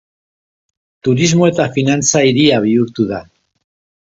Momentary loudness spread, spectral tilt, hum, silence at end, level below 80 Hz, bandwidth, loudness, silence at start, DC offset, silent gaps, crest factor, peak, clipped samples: 9 LU; -4.5 dB/octave; none; 0.9 s; -50 dBFS; 8 kHz; -13 LUFS; 1.05 s; under 0.1%; none; 16 dB; 0 dBFS; under 0.1%